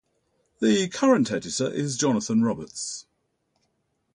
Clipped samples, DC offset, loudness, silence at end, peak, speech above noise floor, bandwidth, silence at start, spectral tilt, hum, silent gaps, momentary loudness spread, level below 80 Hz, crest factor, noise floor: under 0.1%; under 0.1%; -24 LUFS; 1.15 s; -8 dBFS; 50 dB; 11 kHz; 0.6 s; -4.5 dB/octave; none; none; 11 LU; -64 dBFS; 18 dB; -73 dBFS